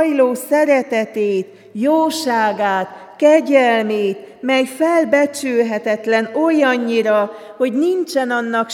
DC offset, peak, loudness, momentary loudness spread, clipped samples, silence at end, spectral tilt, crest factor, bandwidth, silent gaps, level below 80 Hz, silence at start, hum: under 0.1%; 0 dBFS; -16 LUFS; 8 LU; under 0.1%; 0 s; -4.5 dB/octave; 16 dB; 18 kHz; none; -74 dBFS; 0 s; none